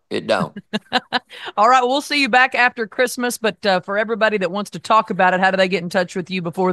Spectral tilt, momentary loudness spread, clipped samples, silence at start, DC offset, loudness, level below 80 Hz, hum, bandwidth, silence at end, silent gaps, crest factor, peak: -4 dB/octave; 10 LU; under 0.1%; 0.1 s; under 0.1%; -18 LUFS; -66 dBFS; none; 12.5 kHz; 0 s; none; 18 dB; 0 dBFS